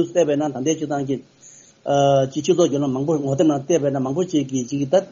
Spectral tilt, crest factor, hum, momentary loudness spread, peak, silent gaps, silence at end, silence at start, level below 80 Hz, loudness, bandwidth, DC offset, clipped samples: -6.5 dB/octave; 16 dB; none; 7 LU; -4 dBFS; none; 0 s; 0 s; -60 dBFS; -20 LUFS; 7.4 kHz; under 0.1%; under 0.1%